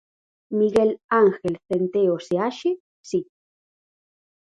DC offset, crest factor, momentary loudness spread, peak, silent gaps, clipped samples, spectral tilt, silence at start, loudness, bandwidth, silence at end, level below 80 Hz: under 0.1%; 18 dB; 10 LU; -6 dBFS; 1.04-1.09 s, 2.80-3.04 s; under 0.1%; -6.5 dB/octave; 0.5 s; -22 LUFS; 11 kHz; 1.25 s; -62 dBFS